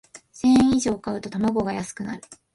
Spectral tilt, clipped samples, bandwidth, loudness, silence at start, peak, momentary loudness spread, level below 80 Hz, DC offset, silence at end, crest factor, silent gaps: -5.5 dB/octave; under 0.1%; 11.5 kHz; -22 LUFS; 0.15 s; -8 dBFS; 16 LU; -50 dBFS; under 0.1%; 0.2 s; 16 dB; none